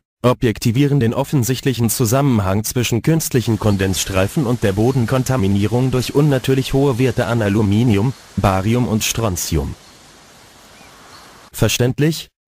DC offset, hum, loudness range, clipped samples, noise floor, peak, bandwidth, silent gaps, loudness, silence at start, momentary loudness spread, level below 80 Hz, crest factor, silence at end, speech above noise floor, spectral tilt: under 0.1%; none; 5 LU; under 0.1%; -44 dBFS; -2 dBFS; 16 kHz; none; -17 LUFS; 0.25 s; 4 LU; -36 dBFS; 16 dB; 0.25 s; 28 dB; -5.5 dB/octave